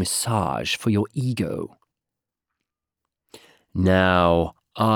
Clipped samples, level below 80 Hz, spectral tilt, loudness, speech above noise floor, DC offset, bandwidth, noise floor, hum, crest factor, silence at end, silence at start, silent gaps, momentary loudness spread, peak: under 0.1%; -52 dBFS; -5 dB/octave; -22 LUFS; 65 dB; under 0.1%; 19.5 kHz; -86 dBFS; none; 20 dB; 0 s; 0 s; none; 13 LU; -4 dBFS